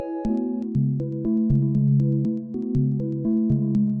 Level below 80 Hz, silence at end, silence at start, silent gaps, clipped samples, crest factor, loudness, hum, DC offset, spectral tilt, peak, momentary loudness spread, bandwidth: -44 dBFS; 0 s; 0 s; none; under 0.1%; 12 dB; -23 LUFS; none; under 0.1%; -12.5 dB/octave; -10 dBFS; 6 LU; 1.8 kHz